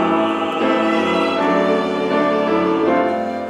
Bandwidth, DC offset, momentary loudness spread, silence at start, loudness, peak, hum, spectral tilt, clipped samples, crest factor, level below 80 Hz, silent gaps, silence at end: 11.5 kHz; under 0.1%; 2 LU; 0 s; -17 LUFS; -4 dBFS; none; -6 dB/octave; under 0.1%; 12 dB; -60 dBFS; none; 0 s